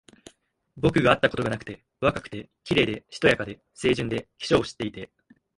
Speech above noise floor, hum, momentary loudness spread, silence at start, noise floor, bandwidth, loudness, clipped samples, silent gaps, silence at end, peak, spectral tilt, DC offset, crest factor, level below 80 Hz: 28 dB; none; 17 LU; 0.75 s; -54 dBFS; 11.5 kHz; -25 LUFS; under 0.1%; none; 0.5 s; -4 dBFS; -5.5 dB/octave; under 0.1%; 22 dB; -50 dBFS